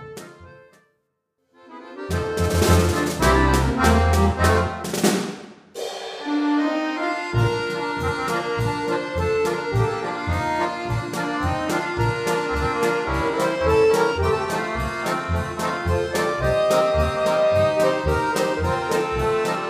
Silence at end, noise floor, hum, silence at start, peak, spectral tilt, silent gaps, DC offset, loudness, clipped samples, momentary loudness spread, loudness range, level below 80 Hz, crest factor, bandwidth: 0 s; -73 dBFS; none; 0 s; -4 dBFS; -5.5 dB/octave; none; under 0.1%; -22 LUFS; under 0.1%; 8 LU; 4 LU; -34 dBFS; 18 dB; 15.5 kHz